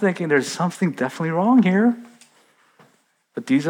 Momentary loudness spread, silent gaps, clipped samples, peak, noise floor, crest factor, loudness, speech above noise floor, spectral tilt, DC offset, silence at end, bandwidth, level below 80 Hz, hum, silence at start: 15 LU; none; under 0.1%; -6 dBFS; -62 dBFS; 16 dB; -20 LUFS; 43 dB; -6.5 dB/octave; under 0.1%; 0 s; 15 kHz; -86 dBFS; none; 0 s